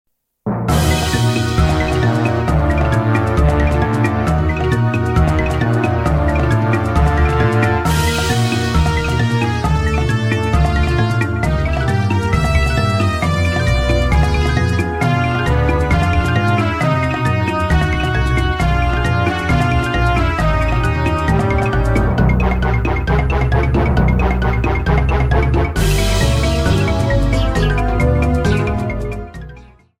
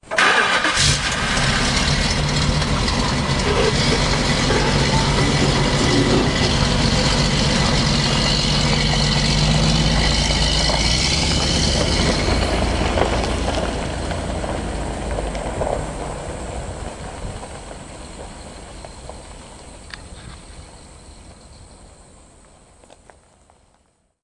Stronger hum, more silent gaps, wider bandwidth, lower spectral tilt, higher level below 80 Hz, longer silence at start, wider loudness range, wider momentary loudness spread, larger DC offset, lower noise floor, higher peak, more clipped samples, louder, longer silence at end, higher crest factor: neither; neither; first, 16 kHz vs 11.5 kHz; first, -6.5 dB/octave vs -4 dB/octave; first, -20 dBFS vs -28 dBFS; first, 0.45 s vs 0.05 s; second, 1 LU vs 19 LU; second, 2 LU vs 20 LU; second, under 0.1% vs 0.1%; second, -40 dBFS vs -62 dBFS; first, 0 dBFS vs -4 dBFS; neither; about the same, -16 LUFS vs -18 LUFS; second, 0.4 s vs 2.4 s; about the same, 14 dB vs 16 dB